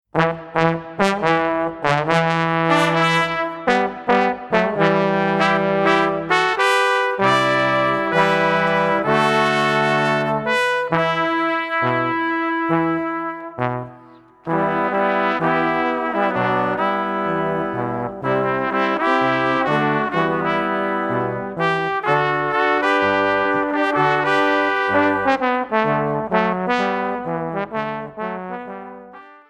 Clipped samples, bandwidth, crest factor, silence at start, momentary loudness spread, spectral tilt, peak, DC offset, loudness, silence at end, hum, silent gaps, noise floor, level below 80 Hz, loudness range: under 0.1%; 14 kHz; 18 dB; 0.15 s; 8 LU; -5.5 dB/octave; -2 dBFS; under 0.1%; -19 LUFS; 0.15 s; none; none; -46 dBFS; -54 dBFS; 4 LU